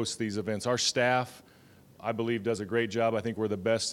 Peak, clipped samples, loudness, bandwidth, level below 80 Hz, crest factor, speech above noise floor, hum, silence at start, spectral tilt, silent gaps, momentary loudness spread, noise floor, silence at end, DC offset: -12 dBFS; under 0.1%; -30 LUFS; 16.5 kHz; -68 dBFS; 18 dB; 27 dB; none; 0 s; -4 dB/octave; none; 7 LU; -57 dBFS; 0 s; under 0.1%